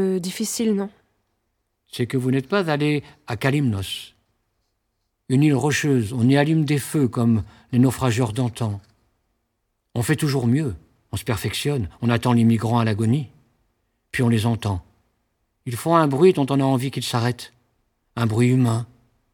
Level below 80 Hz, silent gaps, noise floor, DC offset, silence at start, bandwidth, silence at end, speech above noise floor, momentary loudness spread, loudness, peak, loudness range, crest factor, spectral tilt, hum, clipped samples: -52 dBFS; none; -74 dBFS; under 0.1%; 0 s; 18.5 kHz; 0.5 s; 54 dB; 13 LU; -21 LUFS; -2 dBFS; 4 LU; 20 dB; -6 dB/octave; none; under 0.1%